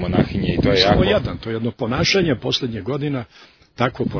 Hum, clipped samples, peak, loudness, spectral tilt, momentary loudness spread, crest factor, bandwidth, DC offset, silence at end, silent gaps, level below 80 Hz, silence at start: none; under 0.1%; 0 dBFS; -19 LUFS; -5.5 dB/octave; 11 LU; 20 dB; 5.4 kHz; under 0.1%; 0 s; none; -36 dBFS; 0 s